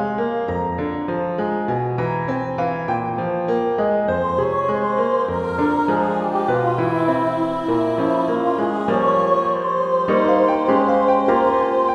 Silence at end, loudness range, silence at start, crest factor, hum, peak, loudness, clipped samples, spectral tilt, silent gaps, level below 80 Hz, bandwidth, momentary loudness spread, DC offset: 0 s; 5 LU; 0 s; 14 dB; none; -4 dBFS; -20 LUFS; under 0.1%; -8 dB/octave; none; -50 dBFS; 8.4 kHz; 6 LU; under 0.1%